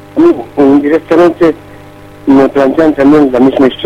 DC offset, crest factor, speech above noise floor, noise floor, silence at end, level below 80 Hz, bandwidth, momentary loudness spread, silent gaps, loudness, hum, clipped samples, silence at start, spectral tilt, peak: under 0.1%; 8 dB; 25 dB; -32 dBFS; 0 s; -40 dBFS; 8.6 kHz; 5 LU; none; -8 LUFS; none; 2%; 0.15 s; -7.5 dB/octave; 0 dBFS